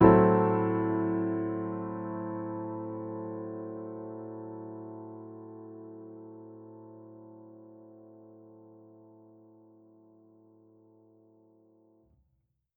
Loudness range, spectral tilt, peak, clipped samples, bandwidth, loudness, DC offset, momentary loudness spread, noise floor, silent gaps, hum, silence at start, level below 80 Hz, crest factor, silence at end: 24 LU; -9.5 dB/octave; -6 dBFS; under 0.1%; 3.5 kHz; -31 LUFS; under 0.1%; 25 LU; -76 dBFS; none; none; 0 s; -58 dBFS; 26 dB; 4.15 s